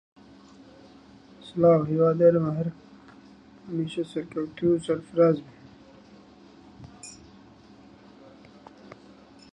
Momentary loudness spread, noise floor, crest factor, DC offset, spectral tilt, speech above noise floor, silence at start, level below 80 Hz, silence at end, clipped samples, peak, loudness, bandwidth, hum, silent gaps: 24 LU; -52 dBFS; 20 dB; under 0.1%; -8 dB/octave; 28 dB; 1.45 s; -64 dBFS; 0.6 s; under 0.1%; -8 dBFS; -24 LUFS; 10.5 kHz; none; none